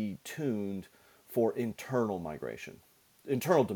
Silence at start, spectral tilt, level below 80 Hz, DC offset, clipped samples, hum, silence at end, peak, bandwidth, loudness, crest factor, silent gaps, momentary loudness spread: 0 s; -6.5 dB/octave; -68 dBFS; under 0.1%; under 0.1%; none; 0 s; -12 dBFS; 19 kHz; -34 LUFS; 20 dB; none; 14 LU